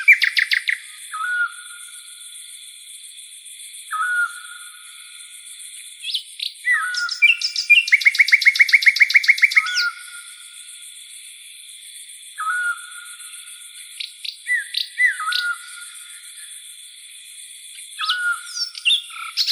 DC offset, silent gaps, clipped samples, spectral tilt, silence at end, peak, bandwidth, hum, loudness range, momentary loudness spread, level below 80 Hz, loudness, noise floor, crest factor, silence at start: under 0.1%; none; under 0.1%; 10.5 dB/octave; 0 s; -2 dBFS; over 20 kHz; none; 15 LU; 24 LU; -88 dBFS; -17 LUFS; -41 dBFS; 20 dB; 0 s